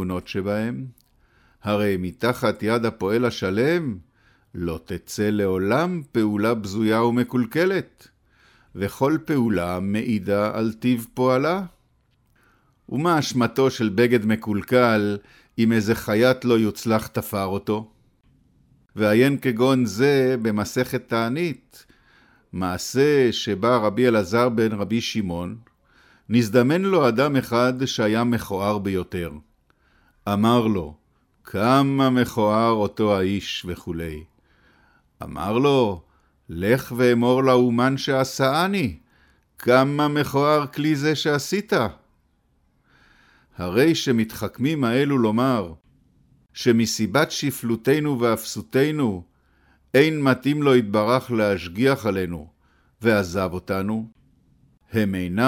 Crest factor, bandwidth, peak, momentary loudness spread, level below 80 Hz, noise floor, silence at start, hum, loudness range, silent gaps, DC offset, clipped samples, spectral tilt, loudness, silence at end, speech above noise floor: 18 dB; 17.5 kHz; -4 dBFS; 12 LU; -54 dBFS; -64 dBFS; 0 s; none; 4 LU; none; under 0.1%; under 0.1%; -6 dB/octave; -22 LUFS; 0 s; 44 dB